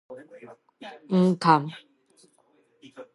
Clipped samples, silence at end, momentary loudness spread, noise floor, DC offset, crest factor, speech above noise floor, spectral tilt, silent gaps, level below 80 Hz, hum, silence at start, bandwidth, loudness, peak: under 0.1%; 0.1 s; 26 LU; -65 dBFS; under 0.1%; 24 dB; 40 dB; -7 dB/octave; none; -78 dBFS; none; 0.1 s; 11.5 kHz; -22 LUFS; -4 dBFS